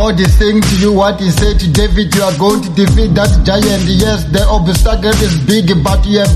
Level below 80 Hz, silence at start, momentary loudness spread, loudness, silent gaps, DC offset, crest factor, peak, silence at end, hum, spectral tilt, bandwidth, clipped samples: -14 dBFS; 0 s; 2 LU; -11 LUFS; none; under 0.1%; 10 dB; 0 dBFS; 0 s; none; -5.5 dB/octave; 13.5 kHz; under 0.1%